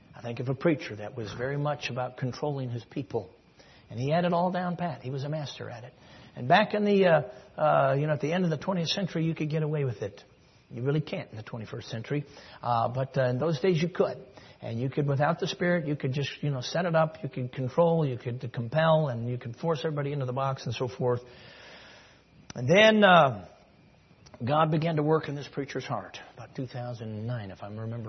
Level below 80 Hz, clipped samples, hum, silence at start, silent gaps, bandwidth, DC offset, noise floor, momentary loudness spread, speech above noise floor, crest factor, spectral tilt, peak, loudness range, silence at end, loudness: -66 dBFS; under 0.1%; none; 0.15 s; none; 6.4 kHz; under 0.1%; -58 dBFS; 16 LU; 30 dB; 22 dB; -6.5 dB/octave; -6 dBFS; 8 LU; 0 s; -28 LUFS